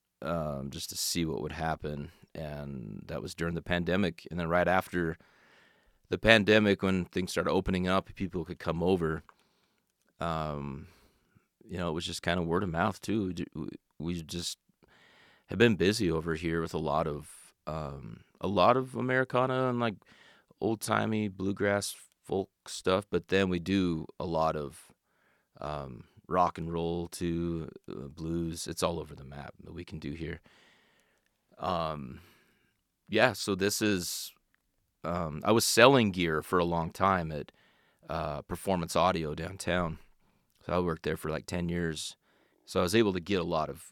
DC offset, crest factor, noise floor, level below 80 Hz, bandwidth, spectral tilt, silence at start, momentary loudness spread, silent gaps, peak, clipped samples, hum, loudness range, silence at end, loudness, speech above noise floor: under 0.1%; 28 dB; -75 dBFS; -56 dBFS; 17.5 kHz; -5 dB/octave; 0.2 s; 16 LU; none; -2 dBFS; under 0.1%; none; 9 LU; 0.05 s; -31 LUFS; 45 dB